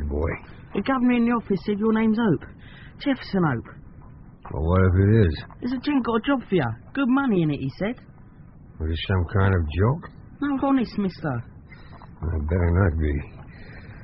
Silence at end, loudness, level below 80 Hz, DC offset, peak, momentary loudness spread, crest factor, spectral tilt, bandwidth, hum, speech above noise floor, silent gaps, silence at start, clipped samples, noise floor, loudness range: 0 s; -24 LUFS; -36 dBFS; under 0.1%; -6 dBFS; 18 LU; 18 dB; -7 dB/octave; 5.8 kHz; none; 24 dB; none; 0 s; under 0.1%; -46 dBFS; 3 LU